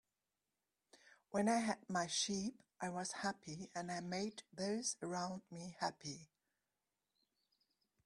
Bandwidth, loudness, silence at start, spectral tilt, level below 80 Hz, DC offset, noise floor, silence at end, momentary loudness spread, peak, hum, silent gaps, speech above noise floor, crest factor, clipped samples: 12.5 kHz; -42 LUFS; 1.05 s; -3.5 dB/octave; -82 dBFS; under 0.1%; under -90 dBFS; 1.8 s; 12 LU; -24 dBFS; none; none; over 48 dB; 22 dB; under 0.1%